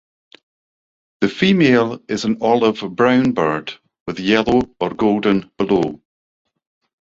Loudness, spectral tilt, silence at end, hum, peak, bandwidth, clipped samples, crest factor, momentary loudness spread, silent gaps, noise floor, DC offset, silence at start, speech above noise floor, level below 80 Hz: -17 LUFS; -6.5 dB/octave; 1.05 s; none; -2 dBFS; 7.8 kHz; under 0.1%; 16 dB; 10 LU; 4.00-4.06 s; under -90 dBFS; under 0.1%; 1.2 s; over 74 dB; -50 dBFS